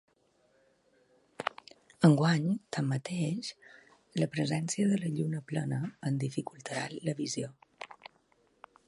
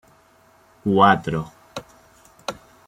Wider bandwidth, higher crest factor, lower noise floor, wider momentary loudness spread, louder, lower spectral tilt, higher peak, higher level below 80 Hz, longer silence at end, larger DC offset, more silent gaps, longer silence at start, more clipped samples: second, 11.5 kHz vs 16 kHz; about the same, 24 dB vs 22 dB; first, -70 dBFS vs -55 dBFS; second, 16 LU vs 22 LU; second, -32 LUFS vs -19 LUFS; about the same, -6 dB/octave vs -6 dB/octave; second, -8 dBFS vs -2 dBFS; second, -74 dBFS vs -56 dBFS; first, 0.95 s vs 0.35 s; neither; neither; first, 1.4 s vs 0.85 s; neither